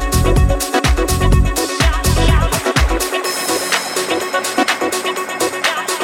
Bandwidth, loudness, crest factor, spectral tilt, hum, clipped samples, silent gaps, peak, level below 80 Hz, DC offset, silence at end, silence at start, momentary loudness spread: 17 kHz; -16 LUFS; 14 dB; -4 dB/octave; none; under 0.1%; none; -2 dBFS; -20 dBFS; under 0.1%; 0 s; 0 s; 4 LU